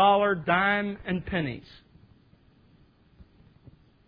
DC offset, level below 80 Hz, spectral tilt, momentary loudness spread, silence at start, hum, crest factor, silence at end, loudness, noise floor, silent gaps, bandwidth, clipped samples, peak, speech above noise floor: under 0.1%; -54 dBFS; -9 dB/octave; 11 LU; 0 s; none; 20 dB; 2.45 s; -26 LUFS; -60 dBFS; none; 5.2 kHz; under 0.1%; -8 dBFS; 32 dB